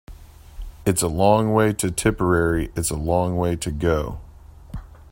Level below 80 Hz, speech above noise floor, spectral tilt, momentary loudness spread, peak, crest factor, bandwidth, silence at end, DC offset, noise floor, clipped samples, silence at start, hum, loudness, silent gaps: -36 dBFS; 21 dB; -5.5 dB/octave; 21 LU; -2 dBFS; 20 dB; 16.5 kHz; 0.2 s; under 0.1%; -42 dBFS; under 0.1%; 0.1 s; none; -21 LUFS; none